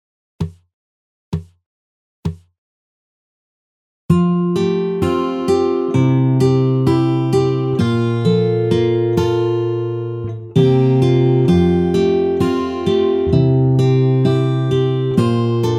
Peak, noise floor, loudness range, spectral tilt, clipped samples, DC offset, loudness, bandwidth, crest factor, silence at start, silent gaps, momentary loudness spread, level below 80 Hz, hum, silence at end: -2 dBFS; under -90 dBFS; 10 LU; -8.5 dB/octave; under 0.1%; under 0.1%; -16 LUFS; 10.5 kHz; 14 dB; 0.4 s; 0.73-1.32 s, 1.66-2.23 s, 2.58-4.09 s; 11 LU; -42 dBFS; none; 0 s